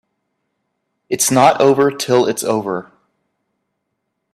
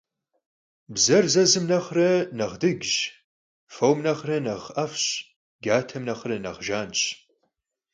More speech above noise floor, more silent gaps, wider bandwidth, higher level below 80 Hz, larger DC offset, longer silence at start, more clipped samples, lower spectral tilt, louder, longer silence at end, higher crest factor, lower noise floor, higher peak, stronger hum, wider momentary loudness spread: first, 59 dB vs 52 dB; second, none vs 3.24-3.67 s, 5.36-5.59 s; first, 15.5 kHz vs 10.5 kHz; about the same, -60 dBFS vs -64 dBFS; neither; first, 1.1 s vs 0.9 s; neither; about the same, -4 dB/octave vs -3.5 dB/octave; first, -15 LUFS vs -24 LUFS; first, 1.5 s vs 0.8 s; about the same, 18 dB vs 18 dB; about the same, -73 dBFS vs -76 dBFS; first, 0 dBFS vs -6 dBFS; neither; about the same, 13 LU vs 12 LU